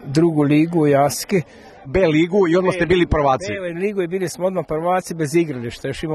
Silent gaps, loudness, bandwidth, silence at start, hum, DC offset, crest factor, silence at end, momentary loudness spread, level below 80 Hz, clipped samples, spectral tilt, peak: none; -18 LUFS; 13 kHz; 0 s; none; under 0.1%; 16 dB; 0 s; 8 LU; -40 dBFS; under 0.1%; -6 dB/octave; -2 dBFS